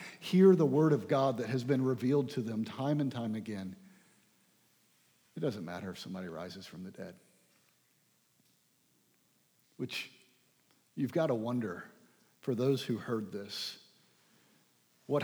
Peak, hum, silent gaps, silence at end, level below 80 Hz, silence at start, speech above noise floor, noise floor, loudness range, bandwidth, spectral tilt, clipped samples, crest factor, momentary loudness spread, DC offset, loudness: -14 dBFS; none; none; 0 s; -84 dBFS; 0 s; 40 dB; -72 dBFS; 16 LU; over 20 kHz; -7 dB/octave; under 0.1%; 22 dB; 20 LU; under 0.1%; -33 LUFS